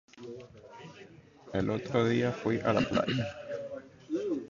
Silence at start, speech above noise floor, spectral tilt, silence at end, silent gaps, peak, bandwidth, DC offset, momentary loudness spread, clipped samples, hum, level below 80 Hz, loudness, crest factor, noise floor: 0.15 s; 24 dB; -6.5 dB/octave; 0 s; none; -14 dBFS; 7.4 kHz; under 0.1%; 21 LU; under 0.1%; none; -60 dBFS; -31 LUFS; 20 dB; -54 dBFS